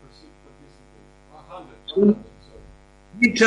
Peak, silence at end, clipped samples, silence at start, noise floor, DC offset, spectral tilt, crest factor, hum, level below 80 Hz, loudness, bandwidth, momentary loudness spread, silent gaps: -6 dBFS; 0 s; under 0.1%; 1.5 s; -51 dBFS; under 0.1%; -5 dB/octave; 18 dB; none; -54 dBFS; -21 LUFS; 11 kHz; 26 LU; none